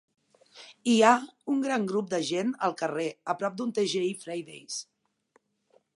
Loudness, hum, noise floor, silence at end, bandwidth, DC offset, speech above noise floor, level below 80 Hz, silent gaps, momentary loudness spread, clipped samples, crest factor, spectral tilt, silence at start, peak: -28 LUFS; none; -69 dBFS; 1.15 s; 11.5 kHz; under 0.1%; 42 dB; -82 dBFS; none; 15 LU; under 0.1%; 22 dB; -4 dB/octave; 0.55 s; -6 dBFS